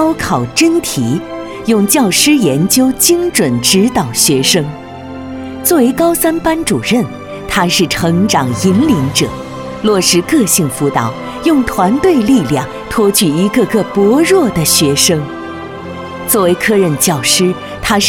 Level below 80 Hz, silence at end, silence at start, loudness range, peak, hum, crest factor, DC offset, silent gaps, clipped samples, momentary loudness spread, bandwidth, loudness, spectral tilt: -38 dBFS; 0 s; 0 s; 2 LU; 0 dBFS; none; 12 dB; under 0.1%; none; under 0.1%; 13 LU; 18.5 kHz; -11 LUFS; -4 dB/octave